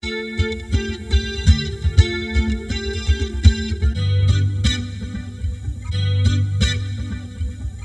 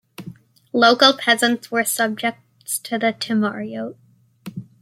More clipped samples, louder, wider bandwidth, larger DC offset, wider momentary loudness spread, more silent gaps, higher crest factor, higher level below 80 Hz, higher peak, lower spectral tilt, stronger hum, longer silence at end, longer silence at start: neither; second, -21 LUFS vs -18 LUFS; second, 9.4 kHz vs 16.5 kHz; neither; second, 11 LU vs 22 LU; neither; about the same, 18 dB vs 20 dB; first, -24 dBFS vs -68 dBFS; about the same, 0 dBFS vs 0 dBFS; first, -5.5 dB/octave vs -2.5 dB/octave; neither; second, 0 s vs 0.2 s; second, 0.05 s vs 0.2 s